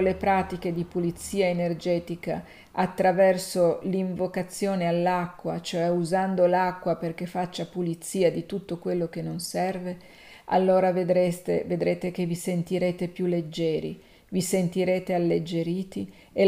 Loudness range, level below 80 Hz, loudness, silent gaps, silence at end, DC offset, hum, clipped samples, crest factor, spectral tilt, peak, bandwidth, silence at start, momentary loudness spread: 3 LU; -56 dBFS; -26 LUFS; none; 0 s; under 0.1%; none; under 0.1%; 16 dB; -6 dB/octave; -8 dBFS; 15.5 kHz; 0 s; 10 LU